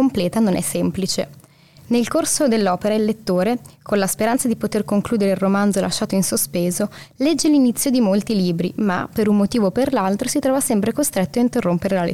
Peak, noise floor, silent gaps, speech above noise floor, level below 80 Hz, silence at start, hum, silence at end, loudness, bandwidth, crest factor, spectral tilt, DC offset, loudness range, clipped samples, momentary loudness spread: -8 dBFS; -47 dBFS; none; 29 dB; -52 dBFS; 0 s; none; 0 s; -19 LUFS; 16.5 kHz; 10 dB; -5 dB/octave; 0.4%; 2 LU; under 0.1%; 5 LU